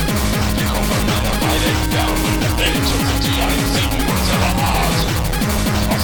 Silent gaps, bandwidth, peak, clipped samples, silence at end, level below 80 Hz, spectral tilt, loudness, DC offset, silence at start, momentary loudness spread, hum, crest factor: none; 19.5 kHz; -2 dBFS; under 0.1%; 0 s; -22 dBFS; -4.5 dB/octave; -17 LUFS; under 0.1%; 0 s; 2 LU; none; 14 dB